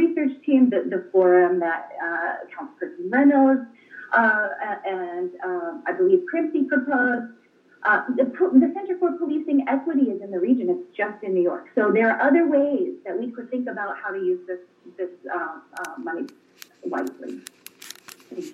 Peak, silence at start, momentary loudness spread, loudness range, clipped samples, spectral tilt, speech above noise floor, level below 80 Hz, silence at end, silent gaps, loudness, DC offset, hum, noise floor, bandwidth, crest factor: -4 dBFS; 0 s; 18 LU; 10 LU; under 0.1%; -6.5 dB/octave; 21 dB; under -90 dBFS; 0 s; none; -22 LUFS; under 0.1%; none; -44 dBFS; 13.5 kHz; 18 dB